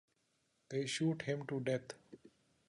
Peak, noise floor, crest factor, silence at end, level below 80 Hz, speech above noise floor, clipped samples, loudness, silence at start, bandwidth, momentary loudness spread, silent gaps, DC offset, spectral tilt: -24 dBFS; -80 dBFS; 18 dB; 0.4 s; -80 dBFS; 41 dB; under 0.1%; -39 LUFS; 0.7 s; 11 kHz; 12 LU; none; under 0.1%; -5 dB/octave